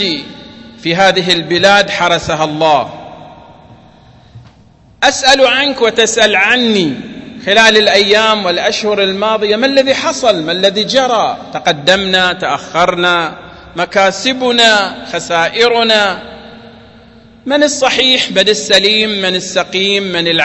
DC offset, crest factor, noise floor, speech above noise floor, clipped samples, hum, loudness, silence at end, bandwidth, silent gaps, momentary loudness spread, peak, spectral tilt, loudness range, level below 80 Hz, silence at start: under 0.1%; 12 dB; -44 dBFS; 32 dB; 0.3%; none; -10 LUFS; 0 s; 11 kHz; none; 10 LU; 0 dBFS; -2.5 dB/octave; 4 LU; -46 dBFS; 0 s